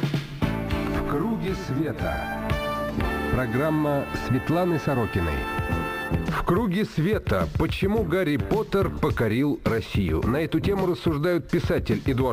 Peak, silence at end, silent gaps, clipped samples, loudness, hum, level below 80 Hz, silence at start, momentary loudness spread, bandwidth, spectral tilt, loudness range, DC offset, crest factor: -10 dBFS; 0 s; none; under 0.1%; -25 LUFS; none; -36 dBFS; 0 s; 4 LU; 15.5 kHz; -7.5 dB/octave; 2 LU; under 0.1%; 14 dB